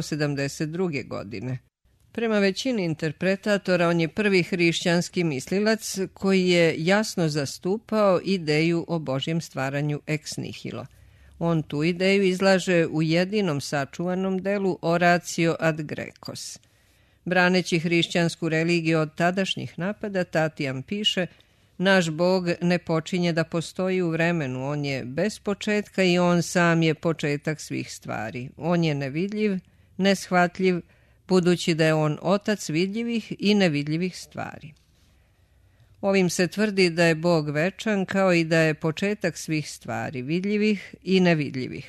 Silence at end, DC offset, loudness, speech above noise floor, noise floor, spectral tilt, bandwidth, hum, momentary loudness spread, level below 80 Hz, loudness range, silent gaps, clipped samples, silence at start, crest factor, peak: 0 s; under 0.1%; -24 LUFS; 37 dB; -60 dBFS; -5.5 dB/octave; 13.5 kHz; none; 11 LU; -60 dBFS; 4 LU; none; under 0.1%; 0 s; 16 dB; -8 dBFS